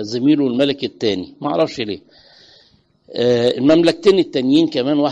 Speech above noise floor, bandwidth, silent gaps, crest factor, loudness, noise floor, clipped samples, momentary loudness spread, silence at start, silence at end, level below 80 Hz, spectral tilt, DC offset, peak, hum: 39 dB; 9.6 kHz; none; 14 dB; -16 LUFS; -55 dBFS; under 0.1%; 10 LU; 0 s; 0 s; -56 dBFS; -6 dB/octave; under 0.1%; -2 dBFS; none